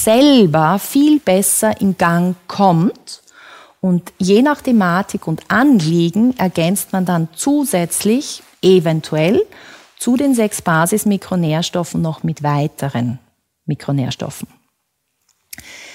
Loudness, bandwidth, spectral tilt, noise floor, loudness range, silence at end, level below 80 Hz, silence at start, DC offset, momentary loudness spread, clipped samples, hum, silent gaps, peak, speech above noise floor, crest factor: -15 LUFS; 16.5 kHz; -5 dB/octave; -70 dBFS; 6 LU; 0 s; -54 dBFS; 0 s; under 0.1%; 13 LU; under 0.1%; none; none; 0 dBFS; 55 dB; 14 dB